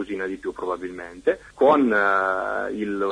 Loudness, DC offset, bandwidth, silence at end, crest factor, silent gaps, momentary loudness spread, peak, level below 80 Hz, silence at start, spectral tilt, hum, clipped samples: -23 LUFS; under 0.1%; 10.5 kHz; 0 s; 18 dB; none; 12 LU; -4 dBFS; -56 dBFS; 0 s; -6 dB/octave; none; under 0.1%